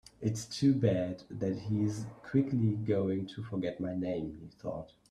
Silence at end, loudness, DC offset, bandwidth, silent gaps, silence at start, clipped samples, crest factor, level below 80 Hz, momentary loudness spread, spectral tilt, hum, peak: 0.25 s; -33 LUFS; under 0.1%; 13 kHz; none; 0.2 s; under 0.1%; 18 dB; -62 dBFS; 12 LU; -7.5 dB/octave; none; -16 dBFS